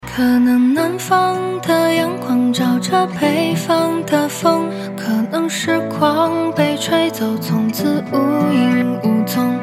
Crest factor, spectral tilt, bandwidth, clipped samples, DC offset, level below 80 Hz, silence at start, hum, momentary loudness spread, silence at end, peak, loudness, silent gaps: 14 dB; -5.5 dB/octave; 16 kHz; under 0.1%; under 0.1%; -54 dBFS; 0.05 s; none; 4 LU; 0 s; -2 dBFS; -16 LUFS; none